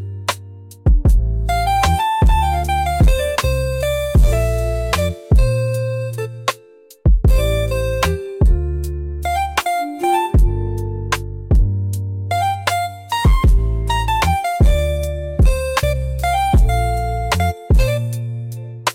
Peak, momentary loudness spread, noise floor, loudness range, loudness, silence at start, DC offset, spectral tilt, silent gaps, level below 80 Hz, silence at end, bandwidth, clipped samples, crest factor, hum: -2 dBFS; 8 LU; -45 dBFS; 2 LU; -18 LUFS; 0 s; under 0.1%; -5.5 dB/octave; none; -18 dBFS; 0 s; 16.5 kHz; under 0.1%; 12 dB; none